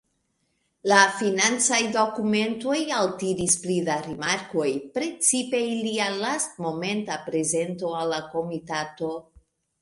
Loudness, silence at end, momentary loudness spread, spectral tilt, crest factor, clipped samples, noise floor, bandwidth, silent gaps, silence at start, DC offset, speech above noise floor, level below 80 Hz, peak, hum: -24 LUFS; 0.6 s; 10 LU; -2.5 dB/octave; 24 dB; under 0.1%; -73 dBFS; 11.5 kHz; none; 0.85 s; under 0.1%; 48 dB; -64 dBFS; -2 dBFS; none